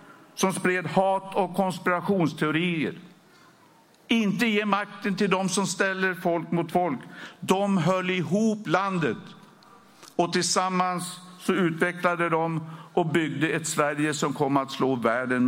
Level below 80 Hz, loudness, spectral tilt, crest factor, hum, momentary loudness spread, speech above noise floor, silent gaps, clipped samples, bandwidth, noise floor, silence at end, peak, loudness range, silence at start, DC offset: -70 dBFS; -25 LUFS; -5 dB/octave; 18 dB; none; 6 LU; 32 dB; none; under 0.1%; 16.5 kHz; -57 dBFS; 0 s; -8 dBFS; 2 LU; 0.05 s; under 0.1%